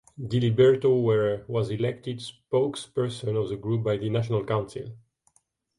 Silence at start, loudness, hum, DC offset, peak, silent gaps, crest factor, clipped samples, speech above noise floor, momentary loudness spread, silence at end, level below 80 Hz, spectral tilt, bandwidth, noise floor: 0.2 s; -26 LUFS; none; under 0.1%; -8 dBFS; none; 18 dB; under 0.1%; 44 dB; 15 LU; 0.8 s; -58 dBFS; -7.5 dB/octave; 11.5 kHz; -69 dBFS